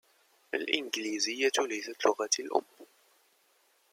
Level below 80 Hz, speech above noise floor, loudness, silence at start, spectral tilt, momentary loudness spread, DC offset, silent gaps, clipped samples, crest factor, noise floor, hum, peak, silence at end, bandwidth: -88 dBFS; 38 dB; -31 LUFS; 0.55 s; 0 dB/octave; 6 LU; under 0.1%; none; under 0.1%; 24 dB; -69 dBFS; none; -10 dBFS; 1.1 s; 16.5 kHz